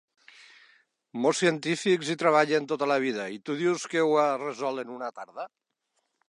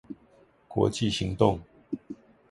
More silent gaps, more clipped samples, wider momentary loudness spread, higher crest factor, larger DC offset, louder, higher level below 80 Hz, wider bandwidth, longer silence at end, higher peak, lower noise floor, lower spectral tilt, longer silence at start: neither; neither; second, 15 LU vs 21 LU; about the same, 20 dB vs 24 dB; neither; about the same, -27 LUFS vs -28 LUFS; second, -82 dBFS vs -50 dBFS; about the same, 11.5 kHz vs 11.5 kHz; first, 0.85 s vs 0.35 s; about the same, -8 dBFS vs -6 dBFS; first, -78 dBFS vs -60 dBFS; second, -4.5 dB/octave vs -6 dB/octave; first, 1.15 s vs 0.1 s